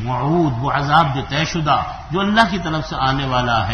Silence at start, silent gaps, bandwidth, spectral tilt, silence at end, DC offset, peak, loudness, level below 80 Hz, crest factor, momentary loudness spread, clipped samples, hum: 0 s; none; 9.8 kHz; -5.5 dB/octave; 0 s; under 0.1%; 0 dBFS; -18 LUFS; -36 dBFS; 18 dB; 6 LU; under 0.1%; none